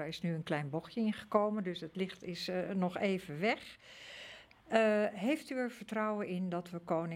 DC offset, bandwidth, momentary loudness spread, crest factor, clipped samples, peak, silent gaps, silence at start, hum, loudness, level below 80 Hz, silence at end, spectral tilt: under 0.1%; 15.5 kHz; 16 LU; 22 dB; under 0.1%; -14 dBFS; none; 0 s; none; -36 LUFS; -74 dBFS; 0 s; -6.5 dB/octave